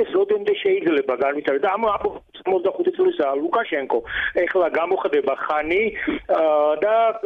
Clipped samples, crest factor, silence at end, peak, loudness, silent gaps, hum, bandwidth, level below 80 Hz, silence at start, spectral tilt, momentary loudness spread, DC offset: under 0.1%; 12 dB; 0 s; -8 dBFS; -21 LUFS; none; none; 4.8 kHz; -52 dBFS; 0 s; -6.5 dB/octave; 5 LU; under 0.1%